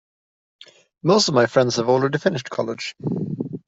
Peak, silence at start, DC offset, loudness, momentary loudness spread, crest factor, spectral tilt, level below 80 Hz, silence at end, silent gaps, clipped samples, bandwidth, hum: -4 dBFS; 1.05 s; under 0.1%; -20 LUFS; 11 LU; 18 dB; -5 dB/octave; -62 dBFS; 0.1 s; none; under 0.1%; 8 kHz; none